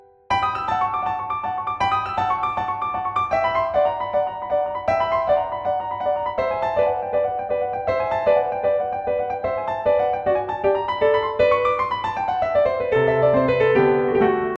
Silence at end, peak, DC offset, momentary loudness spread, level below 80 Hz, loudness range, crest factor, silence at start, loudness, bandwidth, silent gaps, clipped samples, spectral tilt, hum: 0 s; -6 dBFS; under 0.1%; 7 LU; -48 dBFS; 3 LU; 14 dB; 0.3 s; -21 LUFS; 7.4 kHz; none; under 0.1%; -7 dB/octave; none